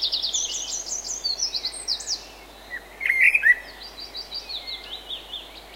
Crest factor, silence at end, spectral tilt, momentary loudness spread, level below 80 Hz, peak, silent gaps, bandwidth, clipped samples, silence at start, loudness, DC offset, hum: 22 dB; 0 s; 2 dB/octave; 20 LU; -54 dBFS; -4 dBFS; none; 16 kHz; under 0.1%; 0 s; -23 LUFS; under 0.1%; none